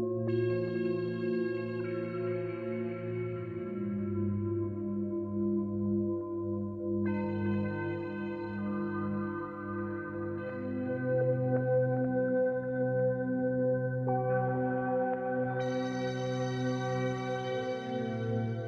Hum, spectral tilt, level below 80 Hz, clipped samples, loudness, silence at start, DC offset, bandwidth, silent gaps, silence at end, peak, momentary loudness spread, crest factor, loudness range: none; -8.5 dB/octave; -66 dBFS; under 0.1%; -33 LUFS; 0 s; under 0.1%; 6.6 kHz; none; 0 s; -18 dBFS; 7 LU; 14 dB; 5 LU